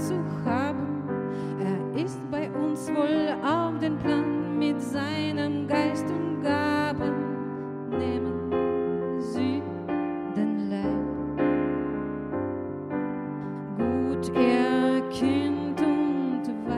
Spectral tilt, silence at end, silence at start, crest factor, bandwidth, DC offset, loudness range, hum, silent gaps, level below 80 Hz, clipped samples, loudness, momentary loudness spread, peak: -7 dB/octave; 0 s; 0 s; 16 dB; 12.5 kHz; under 0.1%; 3 LU; none; none; -54 dBFS; under 0.1%; -27 LUFS; 7 LU; -10 dBFS